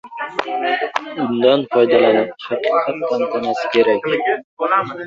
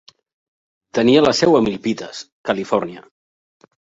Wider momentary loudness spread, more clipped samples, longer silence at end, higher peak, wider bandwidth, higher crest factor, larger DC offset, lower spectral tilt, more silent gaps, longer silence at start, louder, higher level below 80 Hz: second, 9 LU vs 15 LU; neither; second, 0 s vs 1 s; about the same, 0 dBFS vs -2 dBFS; about the same, 7.4 kHz vs 8 kHz; about the same, 16 dB vs 18 dB; neither; about the same, -5.5 dB/octave vs -5 dB/octave; about the same, 4.44-4.57 s vs 2.32-2.44 s; second, 0.05 s vs 0.95 s; about the same, -17 LUFS vs -17 LUFS; second, -62 dBFS vs -56 dBFS